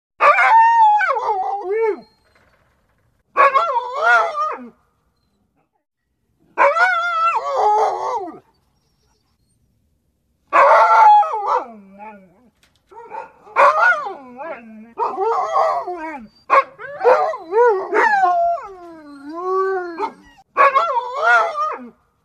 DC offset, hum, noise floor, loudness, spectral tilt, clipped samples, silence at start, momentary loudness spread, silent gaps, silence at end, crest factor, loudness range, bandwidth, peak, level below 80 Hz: under 0.1%; none; -68 dBFS; -16 LUFS; -3 dB/octave; under 0.1%; 0.2 s; 21 LU; none; 0.35 s; 16 dB; 5 LU; 10.5 kHz; -2 dBFS; -66 dBFS